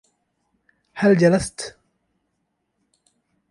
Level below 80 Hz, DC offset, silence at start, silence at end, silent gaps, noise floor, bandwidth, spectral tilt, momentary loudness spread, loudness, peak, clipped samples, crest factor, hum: -52 dBFS; under 0.1%; 0.95 s; 1.8 s; none; -74 dBFS; 11.5 kHz; -6 dB/octave; 19 LU; -18 LUFS; -4 dBFS; under 0.1%; 20 dB; none